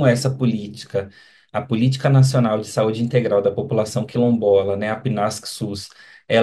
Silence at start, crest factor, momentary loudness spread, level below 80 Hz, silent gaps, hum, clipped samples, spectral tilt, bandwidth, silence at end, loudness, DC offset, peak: 0 s; 16 dB; 12 LU; -60 dBFS; none; none; under 0.1%; -6.5 dB/octave; 12.5 kHz; 0 s; -20 LUFS; under 0.1%; -2 dBFS